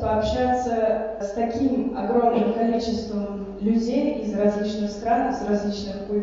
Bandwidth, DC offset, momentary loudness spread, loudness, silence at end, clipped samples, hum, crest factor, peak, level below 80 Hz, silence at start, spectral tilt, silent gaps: 7.6 kHz; under 0.1%; 7 LU; -24 LUFS; 0 s; under 0.1%; none; 16 dB; -8 dBFS; -44 dBFS; 0 s; -6.5 dB/octave; none